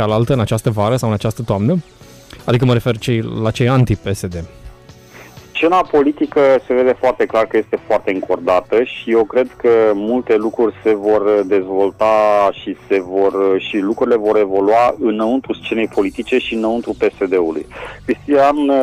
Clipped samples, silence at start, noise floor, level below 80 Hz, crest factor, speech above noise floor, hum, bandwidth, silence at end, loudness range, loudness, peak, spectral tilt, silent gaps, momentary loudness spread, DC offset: under 0.1%; 0 s; -40 dBFS; -42 dBFS; 12 dB; 25 dB; none; 14.5 kHz; 0 s; 3 LU; -15 LUFS; -4 dBFS; -7 dB/octave; none; 7 LU; under 0.1%